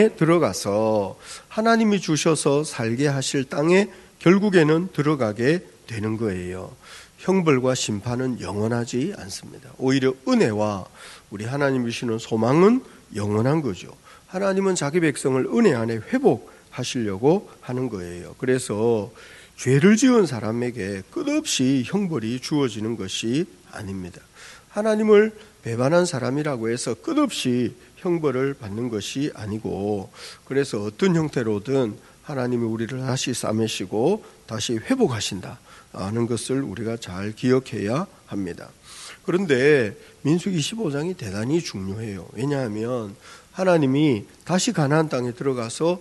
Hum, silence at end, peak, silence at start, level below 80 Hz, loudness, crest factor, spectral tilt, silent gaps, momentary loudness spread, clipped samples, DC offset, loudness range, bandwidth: none; 0 s; -2 dBFS; 0 s; -60 dBFS; -23 LUFS; 20 dB; -5.5 dB/octave; none; 15 LU; under 0.1%; under 0.1%; 5 LU; 12 kHz